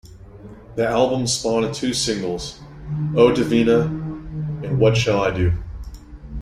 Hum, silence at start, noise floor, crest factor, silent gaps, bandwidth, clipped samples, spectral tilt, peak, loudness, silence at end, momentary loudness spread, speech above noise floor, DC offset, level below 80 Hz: none; 0.05 s; -40 dBFS; 18 dB; none; 14 kHz; under 0.1%; -5.5 dB/octave; -2 dBFS; -20 LUFS; 0 s; 18 LU; 22 dB; under 0.1%; -38 dBFS